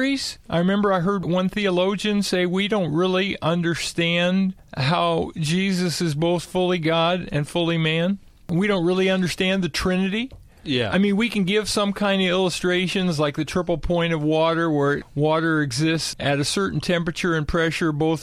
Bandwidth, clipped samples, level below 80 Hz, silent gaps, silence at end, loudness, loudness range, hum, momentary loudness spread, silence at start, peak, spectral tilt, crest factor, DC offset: 14 kHz; under 0.1%; -44 dBFS; none; 0 s; -22 LUFS; 1 LU; none; 4 LU; 0 s; -8 dBFS; -5.5 dB/octave; 14 dB; under 0.1%